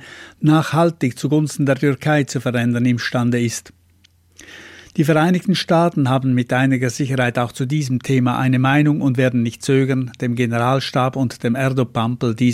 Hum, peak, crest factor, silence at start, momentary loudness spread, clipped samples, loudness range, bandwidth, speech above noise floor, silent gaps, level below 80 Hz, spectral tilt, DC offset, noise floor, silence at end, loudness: none; -4 dBFS; 14 dB; 0 s; 6 LU; under 0.1%; 2 LU; 15 kHz; 38 dB; none; -56 dBFS; -6.5 dB/octave; under 0.1%; -55 dBFS; 0 s; -18 LUFS